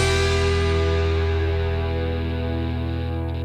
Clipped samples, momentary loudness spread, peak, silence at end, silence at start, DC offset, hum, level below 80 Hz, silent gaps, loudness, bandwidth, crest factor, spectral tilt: under 0.1%; 6 LU; -8 dBFS; 0 s; 0 s; under 0.1%; none; -28 dBFS; none; -23 LUFS; 10.5 kHz; 14 dB; -5.5 dB/octave